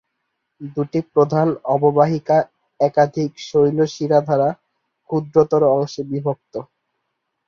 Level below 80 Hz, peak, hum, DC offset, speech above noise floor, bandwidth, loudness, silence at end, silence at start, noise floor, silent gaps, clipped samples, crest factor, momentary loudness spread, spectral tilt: -60 dBFS; -2 dBFS; none; under 0.1%; 57 dB; 7.2 kHz; -18 LUFS; 0.85 s; 0.6 s; -75 dBFS; none; under 0.1%; 18 dB; 14 LU; -7.5 dB/octave